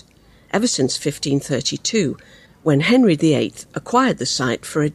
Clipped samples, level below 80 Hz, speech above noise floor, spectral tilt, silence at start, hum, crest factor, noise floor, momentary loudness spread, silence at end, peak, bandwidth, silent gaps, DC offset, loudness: under 0.1%; -54 dBFS; 32 dB; -4.5 dB/octave; 0.55 s; none; 16 dB; -50 dBFS; 10 LU; 0 s; -4 dBFS; 14 kHz; none; under 0.1%; -19 LUFS